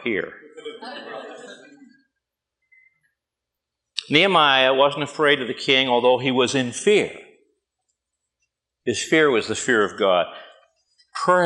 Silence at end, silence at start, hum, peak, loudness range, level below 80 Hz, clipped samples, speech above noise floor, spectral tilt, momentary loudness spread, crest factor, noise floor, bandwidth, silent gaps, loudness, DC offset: 0 s; 0 s; none; 0 dBFS; 16 LU; -70 dBFS; under 0.1%; 65 dB; -3.5 dB/octave; 20 LU; 22 dB; -84 dBFS; 11.5 kHz; none; -19 LUFS; under 0.1%